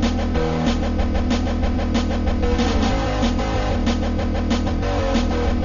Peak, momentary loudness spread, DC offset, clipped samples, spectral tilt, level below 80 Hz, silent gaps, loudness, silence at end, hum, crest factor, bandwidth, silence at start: -6 dBFS; 2 LU; under 0.1%; under 0.1%; -6.5 dB/octave; -24 dBFS; none; -21 LUFS; 0 s; none; 12 dB; 7.4 kHz; 0 s